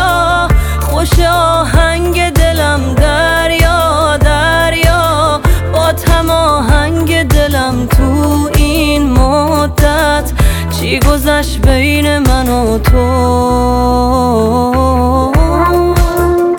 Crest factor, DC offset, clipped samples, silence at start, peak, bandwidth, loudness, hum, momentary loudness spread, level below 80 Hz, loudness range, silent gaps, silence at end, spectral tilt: 10 dB; under 0.1%; under 0.1%; 0 s; 0 dBFS; 17.5 kHz; -10 LUFS; none; 2 LU; -14 dBFS; 1 LU; none; 0 s; -5.5 dB/octave